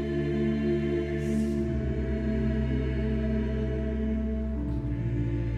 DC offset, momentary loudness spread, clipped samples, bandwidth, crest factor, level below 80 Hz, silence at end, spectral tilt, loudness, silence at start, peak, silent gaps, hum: under 0.1%; 3 LU; under 0.1%; 9.8 kHz; 12 dB; -34 dBFS; 0 s; -9 dB/octave; -29 LUFS; 0 s; -16 dBFS; none; none